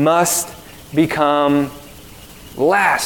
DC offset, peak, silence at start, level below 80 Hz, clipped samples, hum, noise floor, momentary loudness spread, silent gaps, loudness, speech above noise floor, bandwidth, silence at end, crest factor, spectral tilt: 0.1%; -2 dBFS; 0 s; -48 dBFS; under 0.1%; none; -39 dBFS; 20 LU; none; -16 LUFS; 23 dB; 18 kHz; 0 s; 16 dB; -4 dB/octave